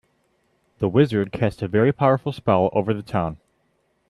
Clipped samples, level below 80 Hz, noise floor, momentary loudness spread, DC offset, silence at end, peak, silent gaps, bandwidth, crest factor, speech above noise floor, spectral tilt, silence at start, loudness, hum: under 0.1%; -52 dBFS; -67 dBFS; 8 LU; under 0.1%; 0.75 s; -4 dBFS; none; 12 kHz; 18 dB; 47 dB; -9 dB/octave; 0.8 s; -21 LUFS; none